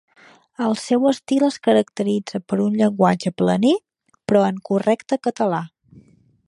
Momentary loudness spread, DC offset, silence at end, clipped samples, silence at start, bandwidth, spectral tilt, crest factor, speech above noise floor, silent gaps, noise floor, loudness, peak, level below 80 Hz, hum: 7 LU; under 0.1%; 0.8 s; under 0.1%; 0.6 s; 11.5 kHz; -6.5 dB/octave; 18 dB; 33 dB; none; -52 dBFS; -20 LUFS; -2 dBFS; -64 dBFS; none